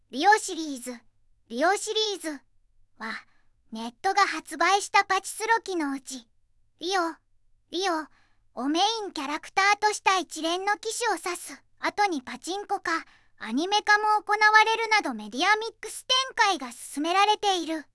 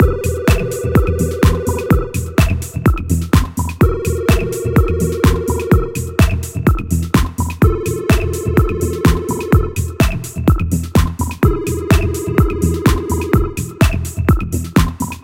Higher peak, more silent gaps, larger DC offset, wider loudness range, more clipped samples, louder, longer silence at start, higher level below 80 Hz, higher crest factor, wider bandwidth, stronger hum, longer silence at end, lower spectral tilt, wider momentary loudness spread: second, -4 dBFS vs 0 dBFS; neither; neither; first, 7 LU vs 1 LU; neither; second, -25 LUFS vs -16 LUFS; about the same, 0.1 s vs 0 s; second, -66 dBFS vs -20 dBFS; first, 22 dB vs 14 dB; second, 12 kHz vs 17 kHz; neither; about the same, 0.1 s vs 0.05 s; second, -0.5 dB/octave vs -6.5 dB/octave; first, 15 LU vs 4 LU